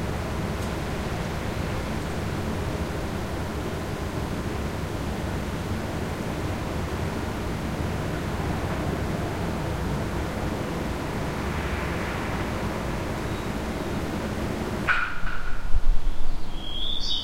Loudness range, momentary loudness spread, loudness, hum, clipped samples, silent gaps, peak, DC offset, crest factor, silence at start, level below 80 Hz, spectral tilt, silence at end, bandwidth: 1 LU; 2 LU; -29 LUFS; none; under 0.1%; none; -6 dBFS; 0.5%; 18 dB; 0 s; -32 dBFS; -5.5 dB/octave; 0 s; 16 kHz